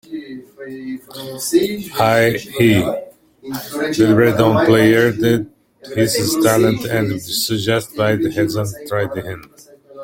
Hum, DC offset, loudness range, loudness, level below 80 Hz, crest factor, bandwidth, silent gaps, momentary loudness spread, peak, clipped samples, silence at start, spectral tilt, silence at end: none; under 0.1%; 4 LU; -16 LUFS; -50 dBFS; 16 dB; 17 kHz; none; 18 LU; 0 dBFS; under 0.1%; 0.1 s; -5 dB/octave; 0 s